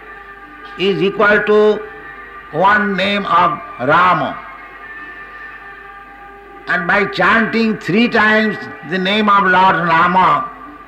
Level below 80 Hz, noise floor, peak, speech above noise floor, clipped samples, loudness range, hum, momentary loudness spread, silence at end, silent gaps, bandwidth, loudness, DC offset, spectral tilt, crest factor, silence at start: -48 dBFS; -36 dBFS; -4 dBFS; 23 dB; under 0.1%; 6 LU; none; 21 LU; 0.05 s; none; 9.2 kHz; -13 LUFS; under 0.1%; -6 dB/octave; 12 dB; 0 s